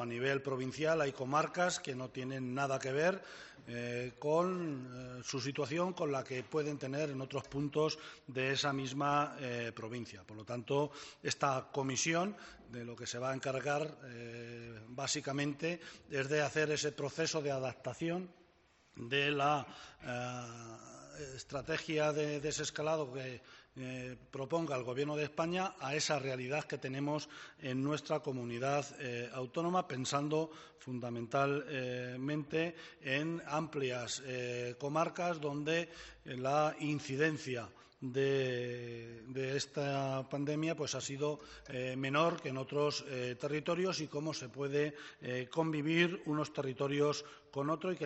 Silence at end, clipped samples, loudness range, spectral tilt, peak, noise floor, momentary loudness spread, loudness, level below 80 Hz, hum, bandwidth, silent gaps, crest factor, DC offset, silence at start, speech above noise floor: 0 s; under 0.1%; 2 LU; -4 dB/octave; -16 dBFS; -69 dBFS; 12 LU; -37 LUFS; -72 dBFS; none; 8 kHz; none; 22 dB; under 0.1%; 0 s; 32 dB